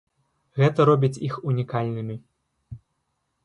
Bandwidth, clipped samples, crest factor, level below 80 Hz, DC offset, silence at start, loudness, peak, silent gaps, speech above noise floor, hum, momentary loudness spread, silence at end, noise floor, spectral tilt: 10.5 kHz; under 0.1%; 18 dB; -60 dBFS; under 0.1%; 0.55 s; -23 LUFS; -6 dBFS; none; 53 dB; none; 16 LU; 0.7 s; -75 dBFS; -8 dB/octave